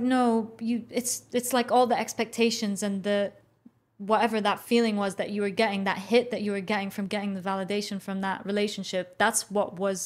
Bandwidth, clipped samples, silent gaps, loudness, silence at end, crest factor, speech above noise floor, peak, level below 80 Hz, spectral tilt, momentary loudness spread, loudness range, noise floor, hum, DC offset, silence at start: 16 kHz; under 0.1%; none; -27 LUFS; 0 s; 18 dB; 32 dB; -8 dBFS; -72 dBFS; -4 dB/octave; 7 LU; 2 LU; -59 dBFS; none; under 0.1%; 0 s